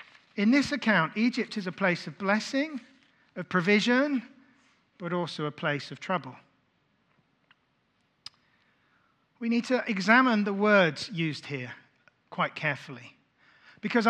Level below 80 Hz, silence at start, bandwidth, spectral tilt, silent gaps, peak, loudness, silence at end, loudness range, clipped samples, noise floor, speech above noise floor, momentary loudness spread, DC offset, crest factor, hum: -76 dBFS; 0.35 s; 10 kHz; -5.5 dB/octave; none; -6 dBFS; -27 LUFS; 0 s; 11 LU; under 0.1%; -72 dBFS; 45 dB; 20 LU; under 0.1%; 24 dB; none